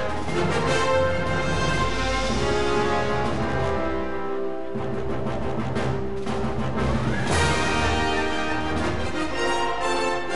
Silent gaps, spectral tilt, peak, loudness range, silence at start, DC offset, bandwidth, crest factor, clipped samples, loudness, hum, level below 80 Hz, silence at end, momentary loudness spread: none; -5 dB/octave; -8 dBFS; 4 LU; 0 s; 3%; 11.5 kHz; 16 dB; under 0.1%; -25 LUFS; none; -36 dBFS; 0 s; 7 LU